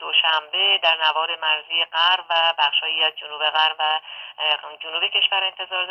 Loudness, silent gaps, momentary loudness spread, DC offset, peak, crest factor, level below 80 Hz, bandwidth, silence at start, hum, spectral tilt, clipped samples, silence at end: -19 LUFS; none; 7 LU; under 0.1%; -4 dBFS; 18 dB; -84 dBFS; 6.8 kHz; 0 s; none; 0 dB/octave; under 0.1%; 0 s